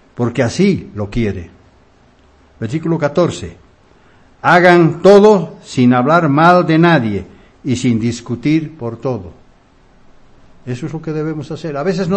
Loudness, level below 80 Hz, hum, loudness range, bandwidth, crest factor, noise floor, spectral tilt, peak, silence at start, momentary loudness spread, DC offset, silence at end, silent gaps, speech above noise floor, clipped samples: -13 LUFS; -42 dBFS; none; 12 LU; 10 kHz; 14 dB; -49 dBFS; -7 dB/octave; 0 dBFS; 0.2 s; 17 LU; under 0.1%; 0 s; none; 36 dB; 0.4%